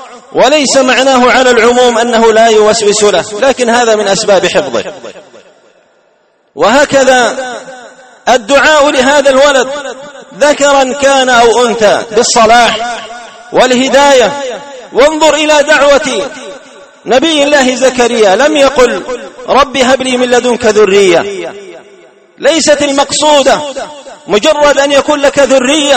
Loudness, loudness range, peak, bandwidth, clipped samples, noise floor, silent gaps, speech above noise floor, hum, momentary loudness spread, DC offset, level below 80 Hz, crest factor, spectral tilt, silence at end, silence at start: -7 LUFS; 4 LU; 0 dBFS; 14 kHz; 1%; -51 dBFS; none; 44 dB; none; 14 LU; under 0.1%; -40 dBFS; 8 dB; -2 dB/octave; 0 s; 0 s